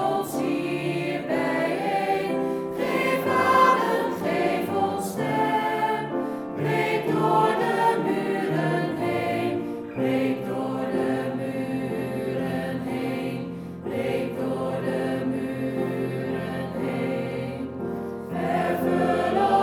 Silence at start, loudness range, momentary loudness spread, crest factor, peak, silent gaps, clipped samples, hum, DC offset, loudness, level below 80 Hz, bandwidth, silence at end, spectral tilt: 0 s; 6 LU; 8 LU; 18 dB; -6 dBFS; none; under 0.1%; none; under 0.1%; -25 LUFS; -60 dBFS; 19.5 kHz; 0 s; -6.5 dB/octave